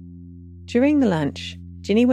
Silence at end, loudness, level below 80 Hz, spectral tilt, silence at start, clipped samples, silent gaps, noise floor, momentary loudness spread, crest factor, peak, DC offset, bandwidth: 0 s; -20 LUFS; -50 dBFS; -7 dB/octave; 0 s; under 0.1%; none; -40 dBFS; 23 LU; 14 dB; -6 dBFS; under 0.1%; 10.5 kHz